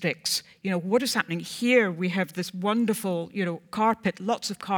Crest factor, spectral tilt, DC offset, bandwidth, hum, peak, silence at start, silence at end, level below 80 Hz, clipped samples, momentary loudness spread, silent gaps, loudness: 20 dB; -4.5 dB/octave; under 0.1%; 19.5 kHz; none; -8 dBFS; 0 s; 0 s; -70 dBFS; under 0.1%; 8 LU; none; -26 LUFS